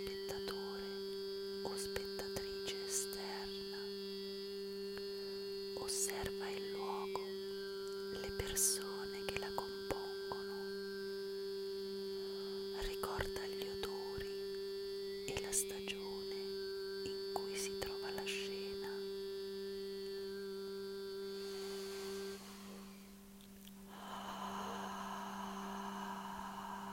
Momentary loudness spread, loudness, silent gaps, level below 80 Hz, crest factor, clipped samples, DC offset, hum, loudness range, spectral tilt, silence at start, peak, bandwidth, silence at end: 6 LU; -43 LUFS; none; -62 dBFS; 26 dB; under 0.1%; under 0.1%; none; 7 LU; -2.5 dB/octave; 0 s; -18 dBFS; 16 kHz; 0 s